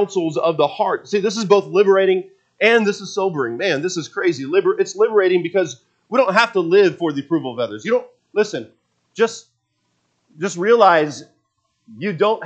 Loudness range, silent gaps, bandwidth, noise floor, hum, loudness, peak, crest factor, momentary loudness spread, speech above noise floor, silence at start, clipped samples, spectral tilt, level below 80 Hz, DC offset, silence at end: 5 LU; none; 8.4 kHz; -69 dBFS; none; -18 LUFS; 0 dBFS; 18 dB; 11 LU; 52 dB; 0 s; under 0.1%; -4.5 dB/octave; -76 dBFS; under 0.1%; 0 s